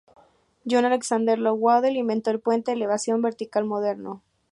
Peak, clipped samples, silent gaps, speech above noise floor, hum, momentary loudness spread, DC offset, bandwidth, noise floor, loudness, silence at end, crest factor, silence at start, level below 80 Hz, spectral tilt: -6 dBFS; under 0.1%; none; 35 dB; none; 10 LU; under 0.1%; 11.5 kHz; -58 dBFS; -23 LUFS; 0.35 s; 16 dB; 0.65 s; -74 dBFS; -4.5 dB/octave